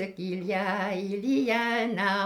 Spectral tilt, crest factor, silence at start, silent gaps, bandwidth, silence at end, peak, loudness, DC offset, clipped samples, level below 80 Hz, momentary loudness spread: -5.5 dB/octave; 16 dB; 0 s; none; 16 kHz; 0 s; -12 dBFS; -28 LUFS; under 0.1%; under 0.1%; -70 dBFS; 6 LU